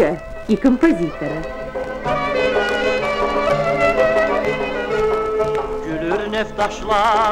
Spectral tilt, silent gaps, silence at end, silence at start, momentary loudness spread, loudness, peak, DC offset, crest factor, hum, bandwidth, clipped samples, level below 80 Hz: -5.5 dB/octave; none; 0 s; 0 s; 9 LU; -19 LUFS; -2 dBFS; under 0.1%; 16 dB; none; 14 kHz; under 0.1%; -36 dBFS